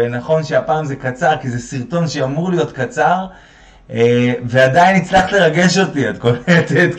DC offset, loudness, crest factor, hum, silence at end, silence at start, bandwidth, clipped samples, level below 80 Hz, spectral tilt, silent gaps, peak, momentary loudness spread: under 0.1%; -15 LUFS; 14 dB; none; 0 s; 0 s; 9.2 kHz; under 0.1%; -46 dBFS; -5.5 dB/octave; none; 0 dBFS; 9 LU